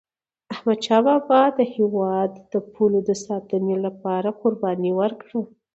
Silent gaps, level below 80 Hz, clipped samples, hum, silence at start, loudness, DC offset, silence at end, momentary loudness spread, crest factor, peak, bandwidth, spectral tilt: none; -68 dBFS; under 0.1%; none; 0.5 s; -22 LUFS; under 0.1%; 0.3 s; 11 LU; 18 dB; -4 dBFS; 8.2 kHz; -6.5 dB/octave